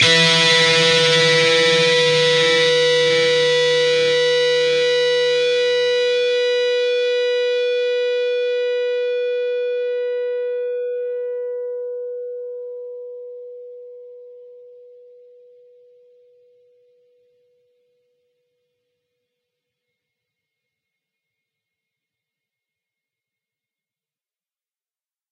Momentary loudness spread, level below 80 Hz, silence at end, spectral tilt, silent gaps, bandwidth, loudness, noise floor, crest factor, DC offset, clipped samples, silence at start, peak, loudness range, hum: 17 LU; -74 dBFS; 10.6 s; -2.5 dB/octave; none; 11 kHz; -16 LUFS; under -90 dBFS; 20 dB; under 0.1%; under 0.1%; 0 s; -2 dBFS; 18 LU; none